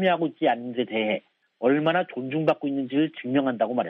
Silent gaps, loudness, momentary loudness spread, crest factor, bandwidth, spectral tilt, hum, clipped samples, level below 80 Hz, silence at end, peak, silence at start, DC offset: none; -25 LUFS; 5 LU; 16 dB; 5.4 kHz; -8.5 dB/octave; none; under 0.1%; -74 dBFS; 0 s; -8 dBFS; 0 s; under 0.1%